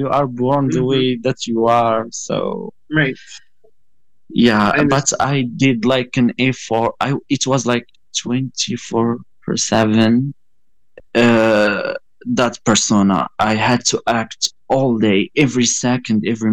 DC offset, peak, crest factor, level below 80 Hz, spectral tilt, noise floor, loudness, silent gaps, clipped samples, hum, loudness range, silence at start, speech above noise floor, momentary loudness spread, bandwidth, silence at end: 0.5%; -2 dBFS; 16 dB; -50 dBFS; -4.5 dB/octave; -73 dBFS; -16 LUFS; none; under 0.1%; none; 3 LU; 0 s; 57 dB; 8 LU; 9.8 kHz; 0 s